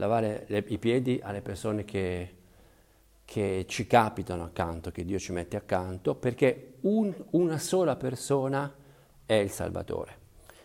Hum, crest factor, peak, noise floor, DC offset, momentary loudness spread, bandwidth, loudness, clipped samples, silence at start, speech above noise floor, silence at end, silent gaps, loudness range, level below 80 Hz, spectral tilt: none; 22 dB; -6 dBFS; -61 dBFS; under 0.1%; 10 LU; 16 kHz; -30 LUFS; under 0.1%; 0 s; 32 dB; 0.5 s; none; 3 LU; -56 dBFS; -6 dB/octave